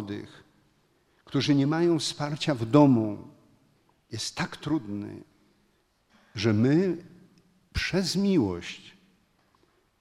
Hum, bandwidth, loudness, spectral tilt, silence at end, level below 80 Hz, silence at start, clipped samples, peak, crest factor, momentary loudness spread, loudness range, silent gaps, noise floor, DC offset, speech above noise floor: none; 13 kHz; -26 LUFS; -6 dB/octave; 1.1 s; -54 dBFS; 0 s; under 0.1%; -6 dBFS; 22 dB; 19 LU; 7 LU; none; -68 dBFS; under 0.1%; 43 dB